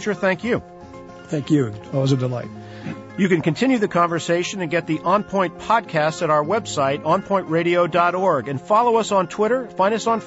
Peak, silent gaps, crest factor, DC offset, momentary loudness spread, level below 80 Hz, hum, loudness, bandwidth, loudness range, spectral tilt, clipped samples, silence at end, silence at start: -6 dBFS; none; 16 dB; under 0.1%; 11 LU; -56 dBFS; none; -20 LUFS; 8 kHz; 4 LU; -6 dB/octave; under 0.1%; 0 s; 0 s